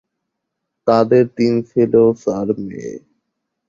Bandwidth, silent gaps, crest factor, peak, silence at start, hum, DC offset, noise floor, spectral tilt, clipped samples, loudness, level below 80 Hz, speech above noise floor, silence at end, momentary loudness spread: 7.4 kHz; none; 16 dB; -2 dBFS; 0.85 s; none; under 0.1%; -77 dBFS; -8 dB/octave; under 0.1%; -16 LUFS; -56 dBFS; 62 dB; 0.7 s; 16 LU